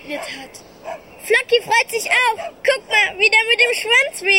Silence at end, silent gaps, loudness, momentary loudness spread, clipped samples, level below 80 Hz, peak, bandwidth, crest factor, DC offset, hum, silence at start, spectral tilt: 0 s; none; -15 LUFS; 20 LU; under 0.1%; -60 dBFS; -2 dBFS; 16.5 kHz; 16 dB; under 0.1%; none; 0.05 s; 0 dB/octave